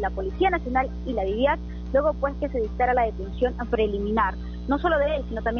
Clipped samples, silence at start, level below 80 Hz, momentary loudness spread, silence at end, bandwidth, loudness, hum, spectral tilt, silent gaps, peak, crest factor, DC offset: under 0.1%; 0 s; -34 dBFS; 6 LU; 0 s; 6.6 kHz; -25 LUFS; 60 Hz at -35 dBFS; -5 dB/octave; none; -10 dBFS; 14 dB; under 0.1%